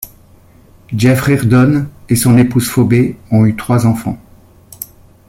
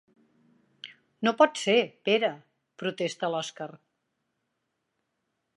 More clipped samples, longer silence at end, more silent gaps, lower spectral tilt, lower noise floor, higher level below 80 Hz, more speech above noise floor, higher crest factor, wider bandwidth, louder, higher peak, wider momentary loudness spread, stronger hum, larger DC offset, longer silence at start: neither; second, 0.45 s vs 1.8 s; neither; first, -6.5 dB/octave vs -4 dB/octave; second, -43 dBFS vs -80 dBFS; first, -40 dBFS vs -86 dBFS; second, 32 dB vs 54 dB; second, 12 dB vs 24 dB; first, 16.5 kHz vs 11.5 kHz; first, -12 LUFS vs -27 LUFS; first, -2 dBFS vs -6 dBFS; second, 19 LU vs 23 LU; neither; neither; second, 0 s vs 0.85 s